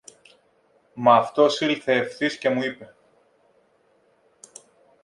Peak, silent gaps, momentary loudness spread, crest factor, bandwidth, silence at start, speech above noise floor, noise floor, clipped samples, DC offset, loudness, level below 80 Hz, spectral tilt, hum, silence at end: -2 dBFS; none; 13 LU; 22 dB; 11.5 kHz; 0.95 s; 42 dB; -63 dBFS; under 0.1%; under 0.1%; -21 LUFS; -72 dBFS; -4.5 dB/octave; none; 2.2 s